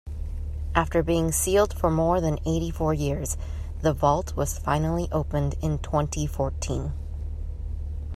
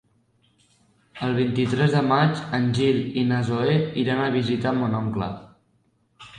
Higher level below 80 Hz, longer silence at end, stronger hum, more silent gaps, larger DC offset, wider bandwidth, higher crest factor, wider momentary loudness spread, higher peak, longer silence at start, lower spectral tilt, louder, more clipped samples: first, -34 dBFS vs -56 dBFS; about the same, 0 s vs 0 s; neither; neither; neither; first, 14.5 kHz vs 9.8 kHz; about the same, 22 dB vs 18 dB; first, 12 LU vs 7 LU; about the same, -4 dBFS vs -6 dBFS; second, 0.05 s vs 1.15 s; second, -5.5 dB/octave vs -7.5 dB/octave; second, -26 LUFS vs -23 LUFS; neither